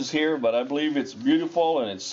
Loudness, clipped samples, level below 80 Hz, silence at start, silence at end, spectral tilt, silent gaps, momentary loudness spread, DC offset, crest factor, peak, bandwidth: -24 LUFS; under 0.1%; -70 dBFS; 0 s; 0 s; -4 dB/octave; none; 4 LU; under 0.1%; 12 dB; -12 dBFS; 7.6 kHz